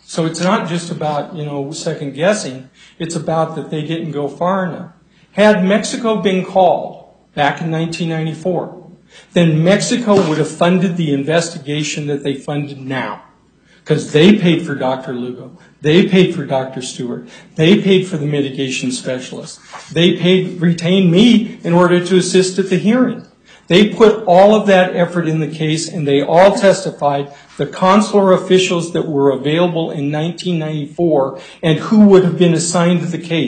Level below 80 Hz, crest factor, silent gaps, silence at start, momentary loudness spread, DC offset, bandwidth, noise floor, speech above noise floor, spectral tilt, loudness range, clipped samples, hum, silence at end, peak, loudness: -56 dBFS; 14 dB; none; 0.1 s; 14 LU; under 0.1%; 9.4 kHz; -50 dBFS; 36 dB; -5.5 dB/octave; 6 LU; under 0.1%; none; 0 s; 0 dBFS; -14 LUFS